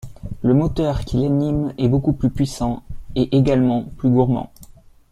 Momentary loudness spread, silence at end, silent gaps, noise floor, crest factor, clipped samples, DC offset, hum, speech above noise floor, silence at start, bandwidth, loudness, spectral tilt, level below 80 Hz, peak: 8 LU; 0.45 s; none; -45 dBFS; 16 dB; under 0.1%; under 0.1%; none; 27 dB; 0.05 s; 13 kHz; -19 LUFS; -8.5 dB/octave; -34 dBFS; -4 dBFS